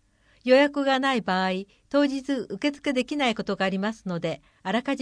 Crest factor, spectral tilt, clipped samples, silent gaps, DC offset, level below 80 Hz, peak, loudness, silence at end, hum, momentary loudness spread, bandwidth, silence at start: 18 dB; -5.5 dB/octave; under 0.1%; none; under 0.1%; -62 dBFS; -8 dBFS; -25 LUFS; 0 s; none; 10 LU; 10.5 kHz; 0.45 s